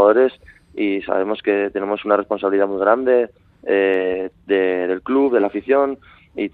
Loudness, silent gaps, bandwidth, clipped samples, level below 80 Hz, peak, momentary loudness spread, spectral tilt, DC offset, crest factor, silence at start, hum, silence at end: -19 LUFS; none; 4.4 kHz; under 0.1%; -58 dBFS; 0 dBFS; 10 LU; -8 dB/octave; under 0.1%; 18 dB; 0 s; none; 0.05 s